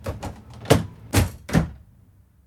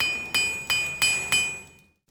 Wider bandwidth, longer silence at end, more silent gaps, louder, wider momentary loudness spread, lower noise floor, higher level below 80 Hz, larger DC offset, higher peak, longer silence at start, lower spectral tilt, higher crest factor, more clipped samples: second, 18 kHz vs over 20 kHz; first, 0.7 s vs 0.4 s; neither; about the same, -23 LUFS vs -23 LUFS; first, 15 LU vs 6 LU; about the same, -54 dBFS vs -52 dBFS; first, -36 dBFS vs -56 dBFS; neither; first, 0 dBFS vs -6 dBFS; about the same, 0 s vs 0 s; first, -5.5 dB/octave vs 0.5 dB/octave; about the same, 24 dB vs 20 dB; neither